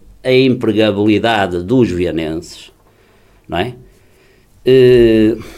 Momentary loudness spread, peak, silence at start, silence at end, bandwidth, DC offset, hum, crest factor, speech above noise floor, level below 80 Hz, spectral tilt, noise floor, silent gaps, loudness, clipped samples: 15 LU; 0 dBFS; 0.25 s; 0 s; 12.5 kHz; under 0.1%; none; 14 dB; 37 dB; -40 dBFS; -7 dB/octave; -49 dBFS; none; -13 LUFS; under 0.1%